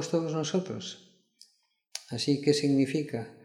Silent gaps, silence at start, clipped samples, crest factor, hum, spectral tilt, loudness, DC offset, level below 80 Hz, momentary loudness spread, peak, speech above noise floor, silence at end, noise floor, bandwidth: none; 0 s; under 0.1%; 20 dB; none; -5.5 dB/octave; -29 LUFS; under 0.1%; -74 dBFS; 17 LU; -10 dBFS; 42 dB; 0.1 s; -71 dBFS; 12.5 kHz